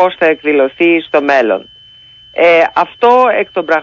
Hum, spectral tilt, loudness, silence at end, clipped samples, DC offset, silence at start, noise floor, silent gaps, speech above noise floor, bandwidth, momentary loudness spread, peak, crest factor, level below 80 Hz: none; -5.5 dB/octave; -11 LUFS; 0 s; under 0.1%; under 0.1%; 0 s; -40 dBFS; none; 29 dB; 7 kHz; 7 LU; 0 dBFS; 12 dB; -56 dBFS